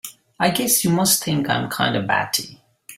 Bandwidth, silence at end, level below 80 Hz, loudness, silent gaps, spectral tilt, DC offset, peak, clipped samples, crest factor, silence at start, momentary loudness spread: 16.5 kHz; 0.05 s; -56 dBFS; -19 LUFS; none; -3 dB/octave; under 0.1%; -2 dBFS; under 0.1%; 18 dB; 0.05 s; 7 LU